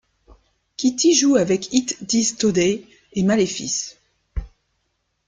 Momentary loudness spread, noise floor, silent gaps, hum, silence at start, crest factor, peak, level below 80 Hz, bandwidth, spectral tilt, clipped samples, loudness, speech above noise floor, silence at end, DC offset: 19 LU; -72 dBFS; none; none; 0.8 s; 18 dB; -4 dBFS; -42 dBFS; 10 kHz; -3.5 dB/octave; under 0.1%; -19 LUFS; 53 dB; 0.8 s; under 0.1%